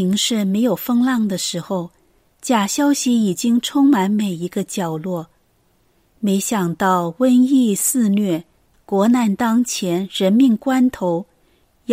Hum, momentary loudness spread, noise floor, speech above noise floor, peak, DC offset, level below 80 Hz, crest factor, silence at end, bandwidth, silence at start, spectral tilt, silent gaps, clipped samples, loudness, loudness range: none; 10 LU; -60 dBFS; 43 dB; -4 dBFS; under 0.1%; -60 dBFS; 14 dB; 0 s; 16 kHz; 0 s; -4.5 dB/octave; none; under 0.1%; -18 LUFS; 3 LU